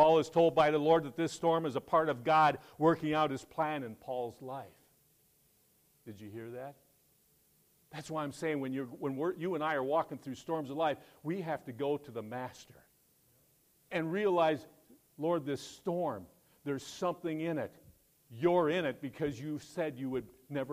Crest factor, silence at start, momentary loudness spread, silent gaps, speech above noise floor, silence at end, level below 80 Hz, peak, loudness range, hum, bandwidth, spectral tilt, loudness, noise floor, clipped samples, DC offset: 20 dB; 0 s; 16 LU; none; 37 dB; 0 s; -72 dBFS; -14 dBFS; 14 LU; none; 15.5 kHz; -6 dB/octave; -34 LUFS; -70 dBFS; under 0.1%; under 0.1%